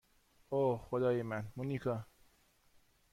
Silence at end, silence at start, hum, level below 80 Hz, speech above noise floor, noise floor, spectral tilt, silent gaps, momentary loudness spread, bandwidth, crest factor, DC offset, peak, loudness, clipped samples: 1.1 s; 0.5 s; none; -68 dBFS; 34 dB; -70 dBFS; -8.5 dB/octave; none; 7 LU; 16 kHz; 16 dB; under 0.1%; -22 dBFS; -37 LUFS; under 0.1%